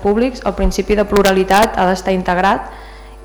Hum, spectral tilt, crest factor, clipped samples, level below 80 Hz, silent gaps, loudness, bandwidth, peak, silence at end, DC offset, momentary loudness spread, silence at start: none; -5 dB/octave; 12 dB; under 0.1%; -28 dBFS; none; -14 LUFS; over 20 kHz; -4 dBFS; 0 s; under 0.1%; 7 LU; 0 s